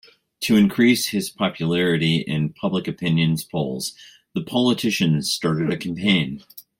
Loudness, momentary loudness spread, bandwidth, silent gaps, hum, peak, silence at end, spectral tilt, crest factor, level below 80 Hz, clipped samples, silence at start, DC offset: -21 LUFS; 11 LU; 16.5 kHz; none; none; -4 dBFS; 0.2 s; -5 dB/octave; 18 dB; -56 dBFS; under 0.1%; 0.4 s; under 0.1%